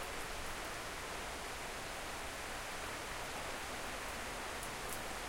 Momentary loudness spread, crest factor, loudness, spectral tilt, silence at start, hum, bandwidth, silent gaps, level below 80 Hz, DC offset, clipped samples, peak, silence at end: 1 LU; 20 dB; -43 LUFS; -2 dB/octave; 0 s; none; 17 kHz; none; -54 dBFS; under 0.1%; under 0.1%; -24 dBFS; 0 s